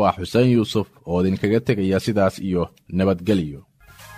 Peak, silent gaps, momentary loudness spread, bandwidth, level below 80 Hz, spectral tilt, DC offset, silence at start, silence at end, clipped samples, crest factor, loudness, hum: -4 dBFS; none; 8 LU; 15 kHz; -48 dBFS; -7 dB/octave; under 0.1%; 0 s; 0 s; under 0.1%; 16 dB; -21 LUFS; none